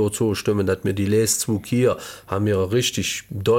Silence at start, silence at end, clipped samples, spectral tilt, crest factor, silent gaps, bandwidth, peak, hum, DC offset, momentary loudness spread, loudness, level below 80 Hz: 0 s; 0 s; under 0.1%; -4.5 dB/octave; 14 dB; none; 17 kHz; -6 dBFS; none; under 0.1%; 6 LU; -21 LUFS; -52 dBFS